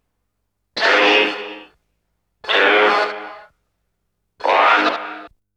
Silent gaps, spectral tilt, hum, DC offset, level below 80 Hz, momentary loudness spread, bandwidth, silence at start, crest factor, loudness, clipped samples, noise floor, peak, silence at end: none; -2 dB/octave; 50 Hz at -70 dBFS; under 0.1%; -68 dBFS; 20 LU; 11 kHz; 0.75 s; 18 dB; -15 LUFS; under 0.1%; -74 dBFS; -2 dBFS; 0.3 s